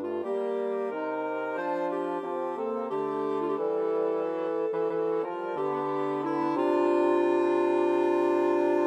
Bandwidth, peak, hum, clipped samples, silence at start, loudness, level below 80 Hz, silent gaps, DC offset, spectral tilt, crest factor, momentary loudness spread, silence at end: 8.4 kHz; -14 dBFS; none; under 0.1%; 0 s; -28 LUFS; -88 dBFS; none; under 0.1%; -7 dB/octave; 14 dB; 7 LU; 0 s